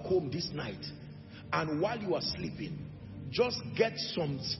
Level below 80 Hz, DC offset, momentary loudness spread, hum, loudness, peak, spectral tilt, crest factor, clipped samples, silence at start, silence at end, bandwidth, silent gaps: -60 dBFS; under 0.1%; 14 LU; none; -34 LUFS; -14 dBFS; -4 dB/octave; 20 dB; under 0.1%; 0 s; 0 s; 6 kHz; none